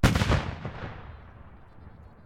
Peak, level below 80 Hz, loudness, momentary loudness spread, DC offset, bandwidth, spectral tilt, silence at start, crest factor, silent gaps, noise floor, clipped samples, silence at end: -12 dBFS; -36 dBFS; -29 LUFS; 26 LU; under 0.1%; 16.5 kHz; -5.5 dB/octave; 0 s; 18 dB; none; -48 dBFS; under 0.1%; 0.2 s